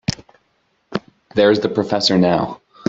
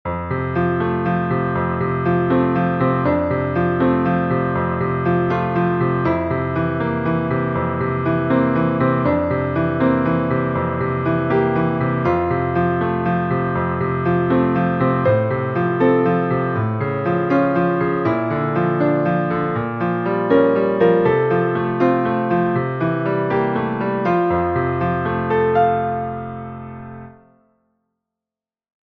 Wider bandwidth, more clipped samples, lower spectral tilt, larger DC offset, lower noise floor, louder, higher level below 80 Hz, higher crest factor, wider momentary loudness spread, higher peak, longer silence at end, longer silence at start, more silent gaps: first, 8 kHz vs 5.2 kHz; neither; second, -5.5 dB/octave vs -10.5 dB/octave; neither; second, -64 dBFS vs -90 dBFS; about the same, -18 LUFS vs -19 LUFS; second, -50 dBFS vs -44 dBFS; about the same, 16 dB vs 16 dB; first, 14 LU vs 4 LU; about the same, -2 dBFS vs -2 dBFS; second, 0.35 s vs 1.8 s; about the same, 0.1 s vs 0.05 s; neither